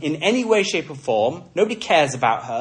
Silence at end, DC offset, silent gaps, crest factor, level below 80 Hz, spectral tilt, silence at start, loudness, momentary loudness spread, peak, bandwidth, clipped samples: 0 s; under 0.1%; none; 16 dB; -64 dBFS; -4 dB/octave; 0 s; -20 LUFS; 5 LU; -4 dBFS; 10.5 kHz; under 0.1%